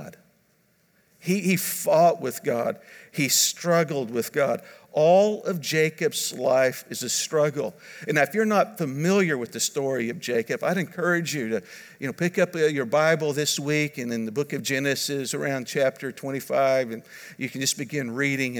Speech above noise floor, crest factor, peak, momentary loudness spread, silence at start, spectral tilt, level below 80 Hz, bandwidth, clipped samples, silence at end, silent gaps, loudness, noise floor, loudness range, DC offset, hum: 40 dB; 18 dB; -8 dBFS; 12 LU; 0 s; -4 dB/octave; -78 dBFS; over 20 kHz; under 0.1%; 0 s; none; -24 LUFS; -65 dBFS; 3 LU; under 0.1%; none